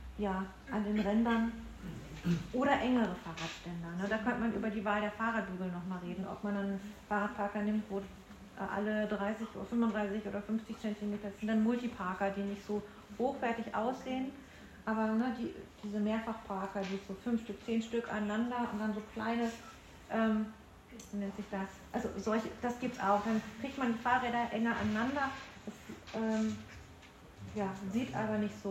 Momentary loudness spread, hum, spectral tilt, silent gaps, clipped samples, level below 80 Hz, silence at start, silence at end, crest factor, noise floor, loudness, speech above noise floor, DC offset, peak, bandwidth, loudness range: 13 LU; none; -6.5 dB/octave; none; under 0.1%; -60 dBFS; 0 s; 0 s; 18 dB; -55 dBFS; -36 LUFS; 20 dB; under 0.1%; -18 dBFS; 13 kHz; 4 LU